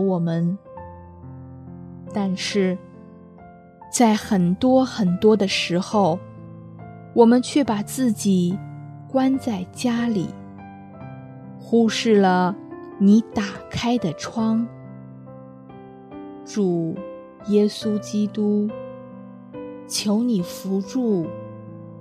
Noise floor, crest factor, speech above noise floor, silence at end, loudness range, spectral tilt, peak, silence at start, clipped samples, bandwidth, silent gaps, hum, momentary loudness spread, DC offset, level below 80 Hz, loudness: -45 dBFS; 20 dB; 25 dB; 0 s; 7 LU; -5.5 dB/octave; -2 dBFS; 0 s; under 0.1%; 14 kHz; none; none; 23 LU; under 0.1%; -60 dBFS; -21 LUFS